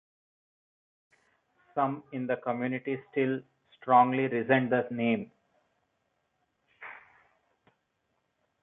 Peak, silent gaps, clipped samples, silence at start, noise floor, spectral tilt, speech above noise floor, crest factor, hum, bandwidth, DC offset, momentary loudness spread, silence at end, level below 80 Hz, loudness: -8 dBFS; none; under 0.1%; 1.75 s; -78 dBFS; -9.5 dB/octave; 50 dB; 24 dB; none; 3.9 kHz; under 0.1%; 23 LU; 1.65 s; -80 dBFS; -29 LUFS